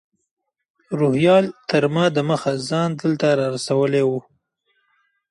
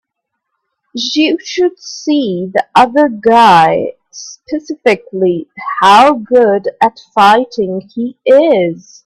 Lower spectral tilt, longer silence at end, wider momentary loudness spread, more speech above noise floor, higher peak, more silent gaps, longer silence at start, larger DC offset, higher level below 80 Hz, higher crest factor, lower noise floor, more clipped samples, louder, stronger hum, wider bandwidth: first, -6 dB/octave vs -4.5 dB/octave; first, 1.1 s vs 0.25 s; second, 6 LU vs 15 LU; second, 50 dB vs 63 dB; about the same, -2 dBFS vs 0 dBFS; neither; about the same, 0.9 s vs 0.95 s; neither; second, -64 dBFS vs -54 dBFS; first, 18 dB vs 12 dB; second, -68 dBFS vs -73 dBFS; neither; second, -19 LUFS vs -11 LUFS; neither; second, 11.5 kHz vs 13.5 kHz